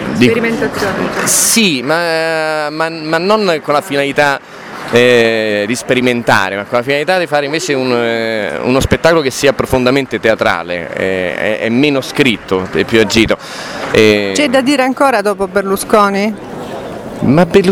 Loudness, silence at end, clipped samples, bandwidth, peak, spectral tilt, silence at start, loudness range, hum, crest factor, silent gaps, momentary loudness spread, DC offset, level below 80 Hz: -12 LUFS; 0 s; 0.3%; 20 kHz; 0 dBFS; -4 dB/octave; 0 s; 2 LU; none; 12 dB; none; 8 LU; under 0.1%; -38 dBFS